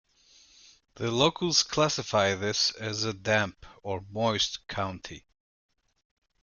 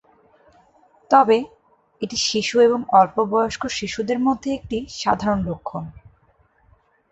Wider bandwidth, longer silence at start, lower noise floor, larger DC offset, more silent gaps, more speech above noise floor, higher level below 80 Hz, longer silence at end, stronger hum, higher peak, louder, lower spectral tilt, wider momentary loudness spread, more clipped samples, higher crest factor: first, 11 kHz vs 8.2 kHz; second, 0.95 s vs 1.1 s; about the same, -60 dBFS vs -60 dBFS; neither; neither; second, 31 dB vs 40 dB; second, -60 dBFS vs -50 dBFS; about the same, 1.25 s vs 1.2 s; neither; second, -6 dBFS vs -2 dBFS; second, -27 LUFS vs -20 LUFS; second, -3 dB/octave vs -4.5 dB/octave; second, 12 LU vs 15 LU; neither; about the same, 24 dB vs 20 dB